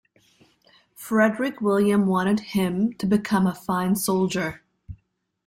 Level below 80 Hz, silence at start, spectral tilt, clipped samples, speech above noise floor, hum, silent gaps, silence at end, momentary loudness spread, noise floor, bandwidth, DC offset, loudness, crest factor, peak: -56 dBFS; 1 s; -6 dB/octave; under 0.1%; 46 dB; none; none; 0.5 s; 6 LU; -68 dBFS; 16.5 kHz; under 0.1%; -23 LUFS; 18 dB; -6 dBFS